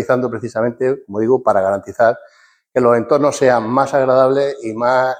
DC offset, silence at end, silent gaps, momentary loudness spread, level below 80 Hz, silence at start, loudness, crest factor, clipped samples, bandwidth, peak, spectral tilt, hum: under 0.1%; 0 s; none; 7 LU; -58 dBFS; 0 s; -16 LUFS; 14 dB; under 0.1%; 15 kHz; -2 dBFS; -6 dB/octave; none